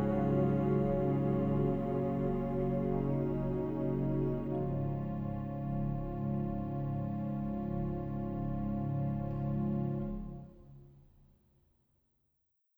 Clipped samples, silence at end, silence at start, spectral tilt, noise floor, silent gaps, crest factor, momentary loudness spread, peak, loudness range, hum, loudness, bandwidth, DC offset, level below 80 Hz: under 0.1%; 1.8 s; 0 s; -11.5 dB/octave; -79 dBFS; none; 14 dB; 7 LU; -20 dBFS; 6 LU; none; -35 LUFS; 3.5 kHz; under 0.1%; -48 dBFS